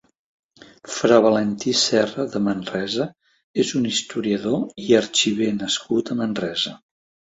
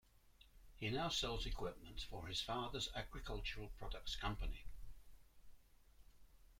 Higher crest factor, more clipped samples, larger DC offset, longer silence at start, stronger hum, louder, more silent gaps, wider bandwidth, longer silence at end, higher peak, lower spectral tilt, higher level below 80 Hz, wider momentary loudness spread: about the same, 20 dB vs 18 dB; neither; neither; first, 0.85 s vs 0.25 s; neither; first, -21 LUFS vs -45 LUFS; first, 3.44-3.54 s vs none; second, 8.2 kHz vs 16.5 kHz; first, 0.6 s vs 0 s; first, -2 dBFS vs -28 dBFS; about the same, -4 dB/octave vs -3.5 dB/octave; second, -60 dBFS vs -52 dBFS; about the same, 9 LU vs 11 LU